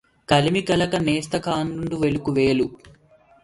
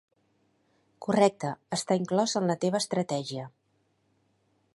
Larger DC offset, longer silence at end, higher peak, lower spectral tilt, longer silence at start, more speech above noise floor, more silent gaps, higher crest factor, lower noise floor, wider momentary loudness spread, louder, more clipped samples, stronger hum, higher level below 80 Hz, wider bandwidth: neither; second, 0.55 s vs 1.25 s; first, -4 dBFS vs -8 dBFS; about the same, -5.5 dB/octave vs -5 dB/octave; second, 0.3 s vs 1 s; second, 33 dB vs 44 dB; neither; about the same, 18 dB vs 22 dB; second, -55 dBFS vs -72 dBFS; second, 6 LU vs 14 LU; first, -22 LUFS vs -28 LUFS; neither; neither; first, -48 dBFS vs -76 dBFS; about the same, 11.5 kHz vs 11.5 kHz